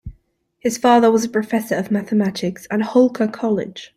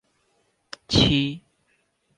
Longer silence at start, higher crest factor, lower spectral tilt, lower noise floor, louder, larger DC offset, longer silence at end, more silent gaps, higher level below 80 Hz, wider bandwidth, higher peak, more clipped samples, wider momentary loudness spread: second, 0.05 s vs 0.9 s; about the same, 18 dB vs 22 dB; about the same, -5.5 dB/octave vs -5 dB/octave; second, -61 dBFS vs -69 dBFS; first, -18 LUFS vs -21 LUFS; neither; second, 0.1 s vs 0.8 s; neither; second, -50 dBFS vs -42 dBFS; first, 15.5 kHz vs 10.5 kHz; about the same, -2 dBFS vs -4 dBFS; neither; second, 10 LU vs 24 LU